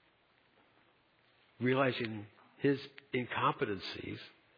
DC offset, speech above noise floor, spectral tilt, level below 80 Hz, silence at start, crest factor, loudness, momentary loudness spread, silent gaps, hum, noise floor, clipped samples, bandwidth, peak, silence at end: under 0.1%; 35 dB; -4 dB/octave; -76 dBFS; 1.6 s; 20 dB; -35 LUFS; 14 LU; none; none; -70 dBFS; under 0.1%; 5.2 kHz; -18 dBFS; 0.3 s